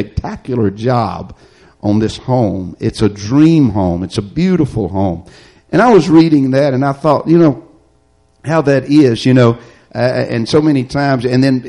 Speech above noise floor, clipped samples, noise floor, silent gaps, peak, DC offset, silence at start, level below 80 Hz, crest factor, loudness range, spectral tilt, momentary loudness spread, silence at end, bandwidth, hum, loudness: 41 dB; under 0.1%; -53 dBFS; none; 0 dBFS; under 0.1%; 0 s; -38 dBFS; 12 dB; 3 LU; -7.5 dB/octave; 11 LU; 0 s; 11 kHz; none; -13 LUFS